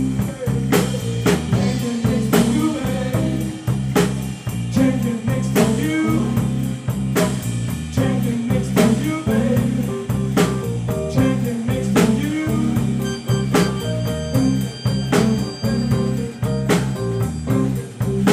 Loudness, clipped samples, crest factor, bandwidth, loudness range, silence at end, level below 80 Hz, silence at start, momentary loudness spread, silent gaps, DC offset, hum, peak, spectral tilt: -20 LUFS; under 0.1%; 18 dB; 16 kHz; 1 LU; 0 s; -36 dBFS; 0 s; 6 LU; none; under 0.1%; none; -2 dBFS; -6.5 dB/octave